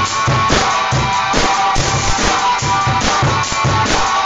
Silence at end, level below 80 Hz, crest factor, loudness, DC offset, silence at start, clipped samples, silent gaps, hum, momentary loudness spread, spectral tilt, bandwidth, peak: 0 s; -28 dBFS; 14 dB; -14 LUFS; under 0.1%; 0 s; under 0.1%; none; none; 2 LU; -3 dB/octave; 11 kHz; 0 dBFS